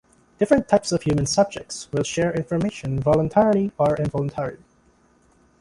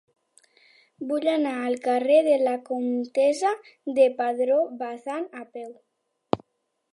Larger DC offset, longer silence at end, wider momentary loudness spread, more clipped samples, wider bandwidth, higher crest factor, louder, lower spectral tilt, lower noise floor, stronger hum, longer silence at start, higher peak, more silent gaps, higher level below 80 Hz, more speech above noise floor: neither; first, 1.05 s vs 0.55 s; second, 9 LU vs 15 LU; neither; about the same, 11.5 kHz vs 11.5 kHz; second, 18 dB vs 24 dB; about the same, -22 LUFS vs -24 LUFS; about the same, -6 dB/octave vs -5 dB/octave; second, -59 dBFS vs -77 dBFS; neither; second, 0.4 s vs 1 s; about the same, -4 dBFS vs -2 dBFS; neither; first, -48 dBFS vs -70 dBFS; second, 38 dB vs 53 dB